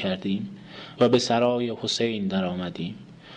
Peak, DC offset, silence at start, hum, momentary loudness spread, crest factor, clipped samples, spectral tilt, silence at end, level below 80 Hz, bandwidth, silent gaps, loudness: -8 dBFS; under 0.1%; 0 s; none; 17 LU; 16 dB; under 0.1%; -5 dB/octave; 0 s; -64 dBFS; 9.8 kHz; none; -25 LUFS